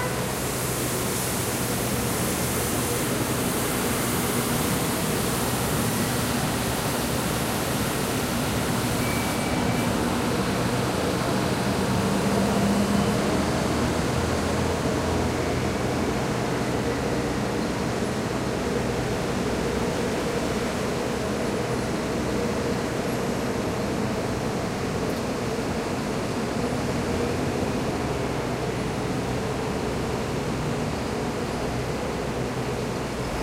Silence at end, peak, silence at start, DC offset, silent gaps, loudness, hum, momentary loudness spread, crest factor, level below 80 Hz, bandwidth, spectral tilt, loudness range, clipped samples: 0 s; -10 dBFS; 0 s; under 0.1%; none; -26 LUFS; none; 4 LU; 14 dB; -40 dBFS; 16 kHz; -4.5 dB/octave; 4 LU; under 0.1%